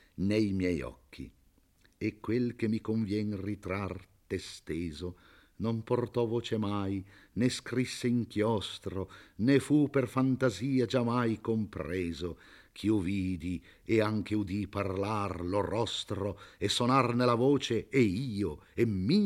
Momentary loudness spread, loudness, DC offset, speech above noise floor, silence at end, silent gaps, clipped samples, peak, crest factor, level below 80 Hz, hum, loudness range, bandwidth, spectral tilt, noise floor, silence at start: 12 LU; -32 LUFS; under 0.1%; 35 dB; 0 s; none; under 0.1%; -12 dBFS; 20 dB; -60 dBFS; none; 6 LU; 15 kHz; -6.5 dB/octave; -66 dBFS; 0.2 s